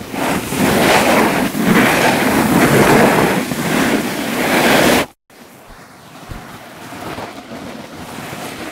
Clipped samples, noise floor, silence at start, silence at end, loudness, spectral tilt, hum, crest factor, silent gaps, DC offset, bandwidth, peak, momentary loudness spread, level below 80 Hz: under 0.1%; -39 dBFS; 0 s; 0 s; -13 LUFS; -4.5 dB/octave; none; 14 dB; none; under 0.1%; 16 kHz; 0 dBFS; 20 LU; -42 dBFS